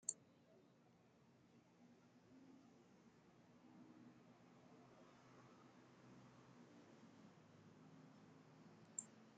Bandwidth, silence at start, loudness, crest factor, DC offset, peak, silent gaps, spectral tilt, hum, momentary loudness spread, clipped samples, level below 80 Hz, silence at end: 7.6 kHz; 0 s; -62 LUFS; 38 dB; under 0.1%; -24 dBFS; none; -5.5 dB/octave; none; 15 LU; under 0.1%; under -90 dBFS; 0 s